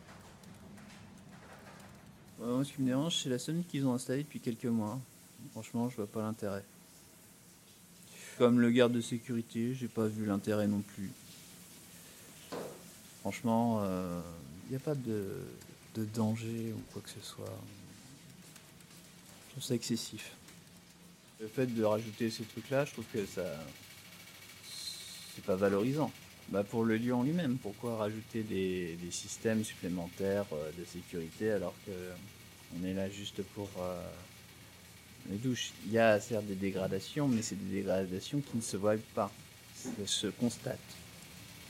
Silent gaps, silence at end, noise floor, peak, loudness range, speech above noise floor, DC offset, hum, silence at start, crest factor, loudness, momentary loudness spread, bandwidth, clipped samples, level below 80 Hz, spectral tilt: none; 0 s; -59 dBFS; -14 dBFS; 9 LU; 24 dB; under 0.1%; none; 0 s; 24 dB; -36 LUFS; 22 LU; 16.5 kHz; under 0.1%; -70 dBFS; -5.5 dB/octave